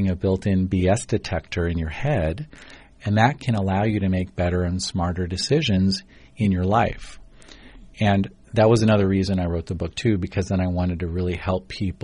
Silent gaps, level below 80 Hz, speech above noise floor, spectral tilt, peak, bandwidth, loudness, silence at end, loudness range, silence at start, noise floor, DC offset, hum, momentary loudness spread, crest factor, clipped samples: none; -40 dBFS; 23 dB; -6.5 dB/octave; -6 dBFS; 10.5 kHz; -22 LUFS; 0.1 s; 2 LU; 0 s; -45 dBFS; under 0.1%; none; 7 LU; 16 dB; under 0.1%